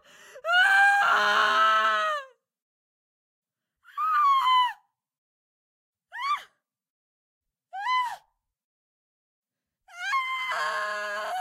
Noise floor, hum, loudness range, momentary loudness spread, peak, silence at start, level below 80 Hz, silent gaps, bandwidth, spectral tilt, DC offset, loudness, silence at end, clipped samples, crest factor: -62 dBFS; none; 13 LU; 15 LU; -10 dBFS; 0.35 s; -86 dBFS; 2.62-3.42 s, 5.18-5.93 s, 6.90-7.41 s, 8.64-9.43 s; 16 kHz; 0.5 dB/octave; under 0.1%; -24 LUFS; 0 s; under 0.1%; 18 dB